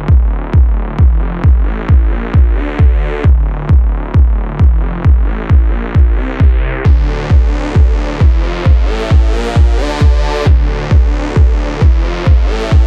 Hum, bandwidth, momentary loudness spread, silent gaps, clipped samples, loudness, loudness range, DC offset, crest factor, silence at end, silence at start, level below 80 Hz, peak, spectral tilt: none; 7.4 kHz; 2 LU; none; under 0.1%; -12 LUFS; 1 LU; under 0.1%; 8 dB; 0 s; 0 s; -10 dBFS; 0 dBFS; -8 dB/octave